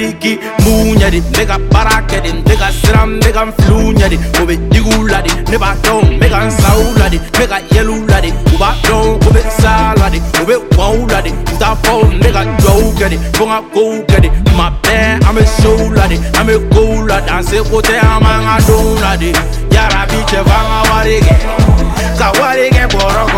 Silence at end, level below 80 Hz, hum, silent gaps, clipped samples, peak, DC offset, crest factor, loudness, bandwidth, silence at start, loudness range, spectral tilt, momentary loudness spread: 0 s; -12 dBFS; none; none; 0.5%; 0 dBFS; under 0.1%; 8 dB; -10 LUFS; 17 kHz; 0 s; 1 LU; -5.5 dB/octave; 4 LU